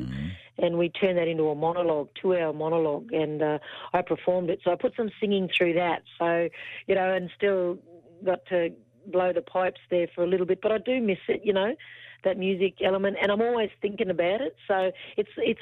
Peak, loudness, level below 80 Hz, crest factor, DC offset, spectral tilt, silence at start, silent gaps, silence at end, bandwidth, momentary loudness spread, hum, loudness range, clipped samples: -12 dBFS; -27 LUFS; -60 dBFS; 16 dB; under 0.1%; -8 dB/octave; 0 s; none; 0 s; 4.5 kHz; 6 LU; none; 2 LU; under 0.1%